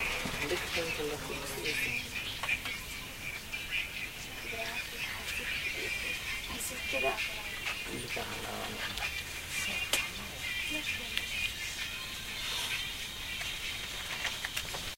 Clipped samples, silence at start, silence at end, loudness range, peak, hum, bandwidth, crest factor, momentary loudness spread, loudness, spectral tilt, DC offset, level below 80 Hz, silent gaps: under 0.1%; 0 s; 0 s; 2 LU; -10 dBFS; none; 16 kHz; 26 dB; 6 LU; -35 LUFS; -1.5 dB/octave; under 0.1%; -52 dBFS; none